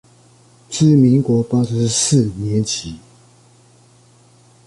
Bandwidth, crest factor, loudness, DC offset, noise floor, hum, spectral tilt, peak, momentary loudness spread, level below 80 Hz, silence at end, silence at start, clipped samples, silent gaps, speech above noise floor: 11.5 kHz; 16 dB; -16 LUFS; under 0.1%; -50 dBFS; none; -5.5 dB/octave; -2 dBFS; 14 LU; -48 dBFS; 1.7 s; 0.7 s; under 0.1%; none; 35 dB